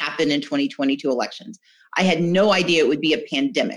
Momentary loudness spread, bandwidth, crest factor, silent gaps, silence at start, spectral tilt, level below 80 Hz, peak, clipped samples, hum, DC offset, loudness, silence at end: 8 LU; 11.5 kHz; 16 dB; none; 0 s; -5 dB/octave; -68 dBFS; -6 dBFS; under 0.1%; none; under 0.1%; -20 LUFS; 0 s